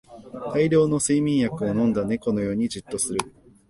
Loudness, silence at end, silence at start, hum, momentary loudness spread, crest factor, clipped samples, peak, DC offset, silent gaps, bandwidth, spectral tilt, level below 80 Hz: -23 LUFS; 0.4 s; 0.1 s; none; 10 LU; 18 dB; under 0.1%; -6 dBFS; under 0.1%; none; 11.5 kHz; -5.5 dB/octave; -52 dBFS